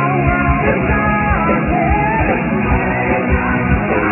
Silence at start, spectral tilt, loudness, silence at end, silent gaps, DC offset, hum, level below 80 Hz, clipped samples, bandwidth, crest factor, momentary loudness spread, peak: 0 s; -11 dB/octave; -15 LUFS; 0 s; none; under 0.1%; none; -22 dBFS; under 0.1%; 3 kHz; 14 dB; 1 LU; -2 dBFS